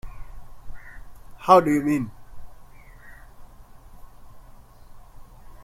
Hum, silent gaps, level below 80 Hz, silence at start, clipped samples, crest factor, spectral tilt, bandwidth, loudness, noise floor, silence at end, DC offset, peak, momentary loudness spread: none; none; -46 dBFS; 0.05 s; under 0.1%; 26 dB; -6.5 dB/octave; 15.5 kHz; -20 LUFS; -46 dBFS; 0 s; under 0.1%; 0 dBFS; 30 LU